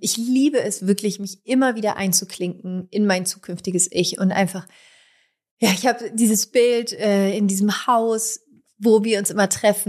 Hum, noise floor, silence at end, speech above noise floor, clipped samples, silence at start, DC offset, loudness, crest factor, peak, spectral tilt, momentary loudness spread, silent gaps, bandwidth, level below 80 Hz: none; -61 dBFS; 0.05 s; 41 dB; under 0.1%; 0 s; under 0.1%; -20 LUFS; 18 dB; -4 dBFS; -4 dB/octave; 9 LU; 5.51-5.57 s; 15.5 kHz; -68 dBFS